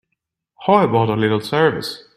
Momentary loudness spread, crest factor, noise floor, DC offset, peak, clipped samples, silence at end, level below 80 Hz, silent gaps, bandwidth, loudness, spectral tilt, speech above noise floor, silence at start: 8 LU; 18 dB; -76 dBFS; under 0.1%; 0 dBFS; under 0.1%; 0.15 s; -54 dBFS; none; 15.5 kHz; -17 LUFS; -6.5 dB/octave; 60 dB; 0.6 s